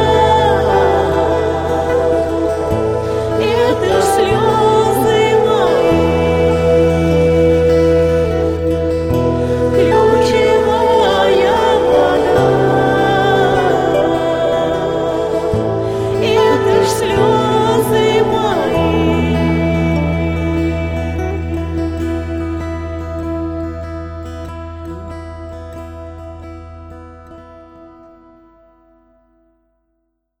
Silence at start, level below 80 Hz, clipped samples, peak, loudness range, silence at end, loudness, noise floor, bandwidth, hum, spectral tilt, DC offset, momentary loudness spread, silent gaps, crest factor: 0 s; -30 dBFS; under 0.1%; -2 dBFS; 14 LU; 2.5 s; -14 LUFS; -68 dBFS; 16.5 kHz; none; -6 dB/octave; under 0.1%; 16 LU; none; 12 dB